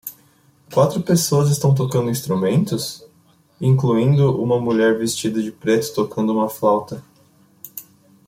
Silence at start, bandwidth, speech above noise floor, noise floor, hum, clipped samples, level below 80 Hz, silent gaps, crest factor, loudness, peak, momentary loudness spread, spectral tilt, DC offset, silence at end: 0.05 s; 16.5 kHz; 38 dB; -55 dBFS; none; under 0.1%; -58 dBFS; none; 16 dB; -19 LUFS; -4 dBFS; 18 LU; -6 dB/octave; under 0.1%; 0.45 s